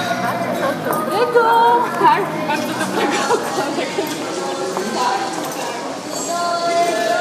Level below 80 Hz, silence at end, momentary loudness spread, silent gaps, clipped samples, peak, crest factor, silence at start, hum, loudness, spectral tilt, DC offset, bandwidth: -66 dBFS; 0 s; 9 LU; none; under 0.1%; -2 dBFS; 16 dB; 0 s; none; -18 LUFS; -3.5 dB/octave; under 0.1%; 15.5 kHz